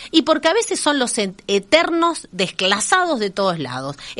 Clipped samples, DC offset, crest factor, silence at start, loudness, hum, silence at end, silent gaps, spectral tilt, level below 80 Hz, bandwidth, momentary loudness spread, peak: under 0.1%; under 0.1%; 18 dB; 0 s; -18 LUFS; none; 0 s; none; -3 dB/octave; -56 dBFS; 11.5 kHz; 7 LU; 0 dBFS